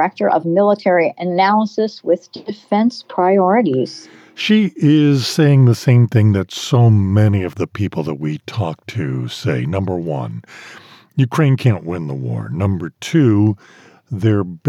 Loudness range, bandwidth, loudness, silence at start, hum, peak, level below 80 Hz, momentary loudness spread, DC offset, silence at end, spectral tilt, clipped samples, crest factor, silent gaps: 7 LU; 13 kHz; -16 LUFS; 0 s; none; -4 dBFS; -58 dBFS; 11 LU; under 0.1%; 0 s; -7.5 dB/octave; under 0.1%; 12 dB; none